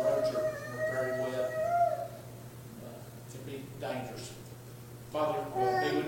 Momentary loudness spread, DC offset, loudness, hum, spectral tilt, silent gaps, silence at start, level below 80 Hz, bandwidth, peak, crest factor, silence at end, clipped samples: 18 LU; under 0.1%; -33 LUFS; none; -5.5 dB/octave; none; 0 s; -64 dBFS; 17 kHz; -18 dBFS; 16 dB; 0 s; under 0.1%